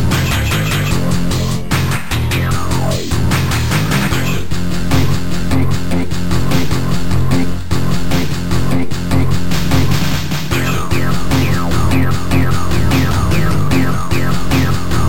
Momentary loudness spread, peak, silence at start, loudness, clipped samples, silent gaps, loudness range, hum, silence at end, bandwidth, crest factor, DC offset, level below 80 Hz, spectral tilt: 3 LU; 0 dBFS; 0 s; -16 LUFS; under 0.1%; none; 2 LU; none; 0 s; 17 kHz; 14 dB; 20%; -24 dBFS; -5.5 dB/octave